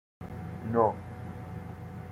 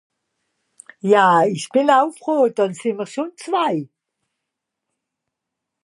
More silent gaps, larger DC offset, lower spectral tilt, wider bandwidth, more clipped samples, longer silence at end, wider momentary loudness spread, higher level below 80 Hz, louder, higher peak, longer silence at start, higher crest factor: neither; neither; first, -9.5 dB/octave vs -5 dB/octave; first, 15.5 kHz vs 11.5 kHz; neither; second, 0 s vs 2 s; about the same, 15 LU vs 13 LU; first, -58 dBFS vs -78 dBFS; second, -33 LUFS vs -18 LUFS; second, -12 dBFS vs -2 dBFS; second, 0.2 s vs 1.05 s; about the same, 22 dB vs 18 dB